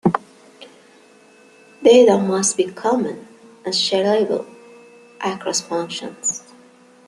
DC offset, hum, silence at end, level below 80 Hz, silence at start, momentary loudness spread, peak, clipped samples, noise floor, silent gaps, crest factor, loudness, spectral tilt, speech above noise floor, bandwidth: under 0.1%; none; 0.7 s; -66 dBFS; 0.05 s; 16 LU; -2 dBFS; under 0.1%; -49 dBFS; none; 18 dB; -18 LUFS; -3.5 dB/octave; 32 dB; 12 kHz